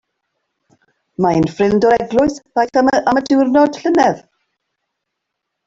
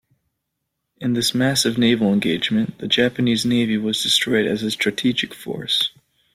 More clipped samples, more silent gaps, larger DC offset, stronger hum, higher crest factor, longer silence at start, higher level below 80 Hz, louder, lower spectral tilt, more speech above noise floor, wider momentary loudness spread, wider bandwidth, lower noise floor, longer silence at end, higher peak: neither; neither; neither; neither; about the same, 14 dB vs 16 dB; first, 1.2 s vs 1 s; first, -48 dBFS vs -58 dBFS; first, -14 LUFS vs -19 LUFS; first, -6 dB/octave vs -4 dB/octave; first, 63 dB vs 58 dB; about the same, 6 LU vs 7 LU; second, 7.8 kHz vs 16 kHz; about the same, -77 dBFS vs -77 dBFS; first, 1.5 s vs 0.45 s; about the same, -2 dBFS vs -4 dBFS